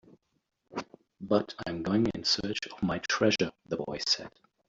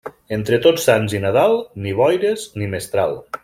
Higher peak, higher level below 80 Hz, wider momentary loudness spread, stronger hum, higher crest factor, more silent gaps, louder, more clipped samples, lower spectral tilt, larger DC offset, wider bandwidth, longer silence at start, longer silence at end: second, -10 dBFS vs -2 dBFS; second, -60 dBFS vs -54 dBFS; first, 14 LU vs 10 LU; neither; first, 22 dB vs 16 dB; neither; second, -30 LUFS vs -18 LUFS; neither; about the same, -4 dB/octave vs -5 dB/octave; neither; second, 7.8 kHz vs 16.5 kHz; first, 0.7 s vs 0.05 s; first, 0.4 s vs 0.05 s